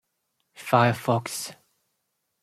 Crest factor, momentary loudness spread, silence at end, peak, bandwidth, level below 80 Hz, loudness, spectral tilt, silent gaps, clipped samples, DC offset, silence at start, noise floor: 24 dB; 16 LU; 0.9 s; -4 dBFS; 15 kHz; -66 dBFS; -24 LUFS; -5 dB/octave; none; under 0.1%; under 0.1%; 0.6 s; -77 dBFS